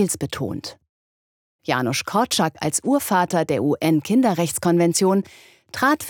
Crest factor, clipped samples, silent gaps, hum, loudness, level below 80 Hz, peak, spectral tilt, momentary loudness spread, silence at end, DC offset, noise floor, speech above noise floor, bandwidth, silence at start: 18 dB; under 0.1%; 0.89-1.59 s; none; -20 LUFS; -62 dBFS; -4 dBFS; -4.5 dB/octave; 11 LU; 0 s; under 0.1%; under -90 dBFS; over 70 dB; over 20 kHz; 0 s